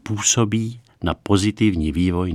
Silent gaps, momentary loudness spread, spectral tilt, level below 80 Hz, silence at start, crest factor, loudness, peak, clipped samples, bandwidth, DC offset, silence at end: none; 10 LU; -4.5 dB/octave; -38 dBFS; 0.05 s; 18 dB; -20 LUFS; -2 dBFS; under 0.1%; 15 kHz; under 0.1%; 0 s